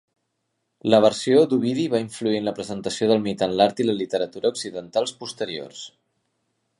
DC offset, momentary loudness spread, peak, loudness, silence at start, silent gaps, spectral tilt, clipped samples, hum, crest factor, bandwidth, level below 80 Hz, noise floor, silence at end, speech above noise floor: under 0.1%; 13 LU; -2 dBFS; -22 LUFS; 0.85 s; none; -5 dB/octave; under 0.1%; none; 22 dB; 11.5 kHz; -64 dBFS; -76 dBFS; 0.9 s; 54 dB